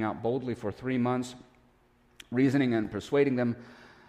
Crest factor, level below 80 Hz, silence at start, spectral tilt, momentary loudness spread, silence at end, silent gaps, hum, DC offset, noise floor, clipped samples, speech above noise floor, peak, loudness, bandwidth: 16 dB; -62 dBFS; 0 s; -7 dB/octave; 9 LU; 0.2 s; none; none; under 0.1%; -64 dBFS; under 0.1%; 35 dB; -14 dBFS; -29 LUFS; 12 kHz